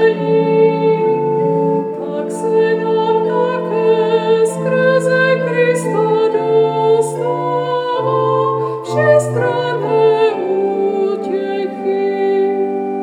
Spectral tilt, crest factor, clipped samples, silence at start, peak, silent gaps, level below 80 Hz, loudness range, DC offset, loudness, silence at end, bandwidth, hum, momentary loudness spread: -6.5 dB/octave; 14 dB; under 0.1%; 0 s; -2 dBFS; none; -74 dBFS; 2 LU; under 0.1%; -15 LUFS; 0 s; 11.5 kHz; none; 6 LU